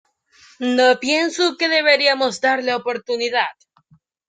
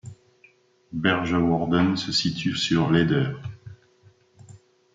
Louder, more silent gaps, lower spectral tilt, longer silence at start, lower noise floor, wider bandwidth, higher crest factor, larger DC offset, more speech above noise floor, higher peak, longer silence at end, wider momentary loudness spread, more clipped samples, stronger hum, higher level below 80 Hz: first, -18 LUFS vs -23 LUFS; neither; second, -2 dB/octave vs -5.5 dB/octave; first, 0.6 s vs 0.05 s; about the same, -58 dBFS vs -59 dBFS; about the same, 9.4 kHz vs 9.2 kHz; about the same, 18 dB vs 20 dB; neither; first, 40 dB vs 36 dB; about the same, -2 dBFS vs -4 dBFS; first, 0.75 s vs 0.4 s; second, 9 LU vs 16 LU; neither; neither; second, -72 dBFS vs -56 dBFS